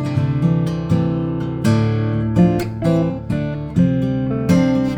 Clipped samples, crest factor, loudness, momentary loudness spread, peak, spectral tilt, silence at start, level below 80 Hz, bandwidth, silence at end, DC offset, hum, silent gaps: under 0.1%; 14 dB; -18 LUFS; 6 LU; -2 dBFS; -8.5 dB/octave; 0 s; -38 dBFS; 14.5 kHz; 0 s; under 0.1%; none; none